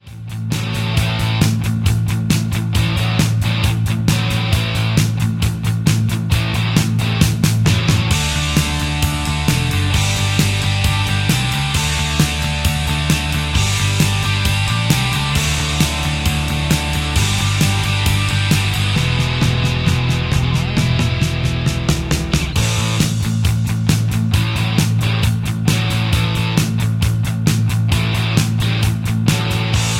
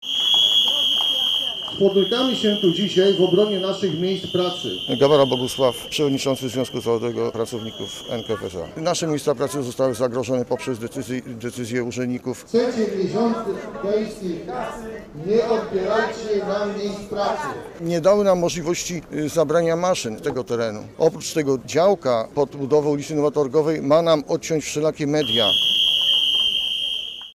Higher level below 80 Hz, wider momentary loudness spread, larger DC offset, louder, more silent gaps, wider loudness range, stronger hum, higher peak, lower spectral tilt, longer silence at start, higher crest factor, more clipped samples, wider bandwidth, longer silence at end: first, -28 dBFS vs -54 dBFS; second, 2 LU vs 12 LU; neither; first, -17 LUFS vs -20 LUFS; neither; second, 1 LU vs 7 LU; neither; first, 0 dBFS vs -4 dBFS; about the same, -4.5 dB/octave vs -4 dB/octave; about the same, 0.05 s vs 0 s; about the same, 16 dB vs 16 dB; neither; about the same, 16.5 kHz vs 16 kHz; about the same, 0 s vs 0.05 s